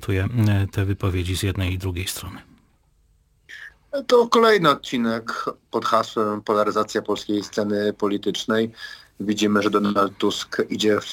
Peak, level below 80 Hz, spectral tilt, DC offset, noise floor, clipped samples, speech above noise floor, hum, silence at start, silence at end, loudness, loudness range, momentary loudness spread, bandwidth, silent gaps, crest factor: -2 dBFS; -50 dBFS; -5.5 dB/octave; under 0.1%; -60 dBFS; under 0.1%; 39 dB; none; 0 s; 0 s; -22 LUFS; 5 LU; 12 LU; 17 kHz; none; 20 dB